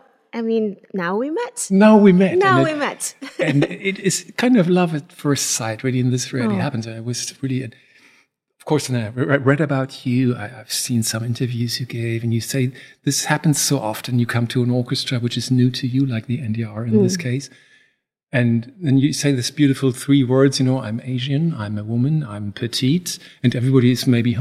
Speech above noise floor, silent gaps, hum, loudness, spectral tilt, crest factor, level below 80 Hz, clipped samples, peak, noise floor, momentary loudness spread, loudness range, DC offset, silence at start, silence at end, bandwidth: 46 dB; 18.23-18.27 s; none; -19 LUFS; -5.5 dB/octave; 18 dB; -62 dBFS; under 0.1%; -2 dBFS; -65 dBFS; 10 LU; 6 LU; under 0.1%; 0.35 s; 0 s; 15.5 kHz